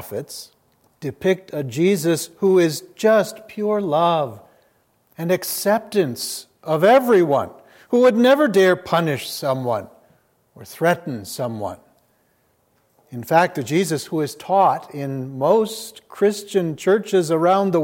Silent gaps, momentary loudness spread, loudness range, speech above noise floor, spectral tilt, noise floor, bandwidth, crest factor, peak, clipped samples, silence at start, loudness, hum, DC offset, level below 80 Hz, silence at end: none; 15 LU; 7 LU; 44 dB; -5 dB/octave; -63 dBFS; 17 kHz; 18 dB; -2 dBFS; under 0.1%; 0 s; -19 LUFS; none; under 0.1%; -68 dBFS; 0 s